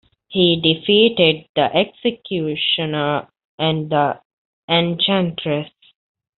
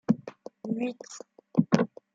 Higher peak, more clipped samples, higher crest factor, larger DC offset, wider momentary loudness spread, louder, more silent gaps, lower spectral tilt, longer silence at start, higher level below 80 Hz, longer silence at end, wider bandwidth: first, -2 dBFS vs -6 dBFS; neither; second, 18 dB vs 24 dB; neither; second, 10 LU vs 19 LU; first, -18 LUFS vs -29 LUFS; first, 1.49-1.54 s, 3.45-3.58 s, 4.25-4.68 s vs none; second, -3 dB/octave vs -7 dB/octave; first, 0.3 s vs 0.1 s; first, -58 dBFS vs -70 dBFS; first, 0.7 s vs 0.3 s; second, 4.4 kHz vs 8 kHz